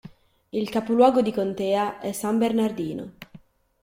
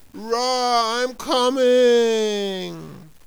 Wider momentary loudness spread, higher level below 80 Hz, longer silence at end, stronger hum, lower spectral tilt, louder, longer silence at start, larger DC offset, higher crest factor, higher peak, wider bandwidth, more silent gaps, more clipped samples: about the same, 13 LU vs 12 LU; second, -62 dBFS vs -56 dBFS; first, 0.45 s vs 0.2 s; neither; first, -5.5 dB/octave vs -3 dB/octave; second, -24 LUFS vs -19 LUFS; about the same, 0.05 s vs 0.15 s; neither; first, 20 dB vs 12 dB; about the same, -6 dBFS vs -8 dBFS; second, 16.5 kHz vs over 20 kHz; neither; neither